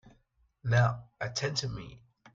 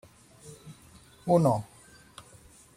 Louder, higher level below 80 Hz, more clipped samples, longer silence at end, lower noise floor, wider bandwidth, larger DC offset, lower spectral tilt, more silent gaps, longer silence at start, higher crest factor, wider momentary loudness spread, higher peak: second, -31 LUFS vs -26 LUFS; first, -58 dBFS vs -64 dBFS; neither; second, 0.4 s vs 1.15 s; first, -70 dBFS vs -55 dBFS; second, 7.6 kHz vs 15.5 kHz; neither; second, -4.5 dB/octave vs -8 dB/octave; neither; second, 0.05 s vs 0.45 s; about the same, 20 dB vs 22 dB; second, 15 LU vs 26 LU; second, -14 dBFS vs -10 dBFS